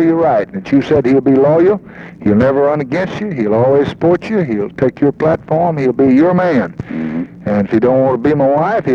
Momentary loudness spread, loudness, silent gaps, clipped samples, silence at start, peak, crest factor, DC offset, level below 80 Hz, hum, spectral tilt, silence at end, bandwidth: 9 LU; -13 LUFS; none; under 0.1%; 0 s; 0 dBFS; 12 dB; under 0.1%; -46 dBFS; none; -9 dB/octave; 0 s; 7 kHz